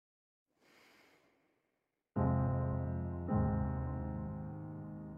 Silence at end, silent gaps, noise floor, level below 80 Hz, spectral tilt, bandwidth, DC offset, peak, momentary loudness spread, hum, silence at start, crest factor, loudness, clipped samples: 0 s; none; -86 dBFS; -52 dBFS; -11.5 dB/octave; 3.1 kHz; under 0.1%; -22 dBFS; 12 LU; none; 2.15 s; 18 dB; -38 LUFS; under 0.1%